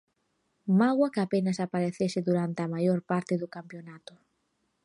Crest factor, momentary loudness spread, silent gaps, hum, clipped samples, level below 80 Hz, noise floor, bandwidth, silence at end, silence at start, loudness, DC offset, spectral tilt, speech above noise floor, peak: 16 dB; 17 LU; none; none; under 0.1%; -74 dBFS; -76 dBFS; 11 kHz; 0.85 s; 0.65 s; -28 LUFS; under 0.1%; -7.5 dB/octave; 48 dB; -12 dBFS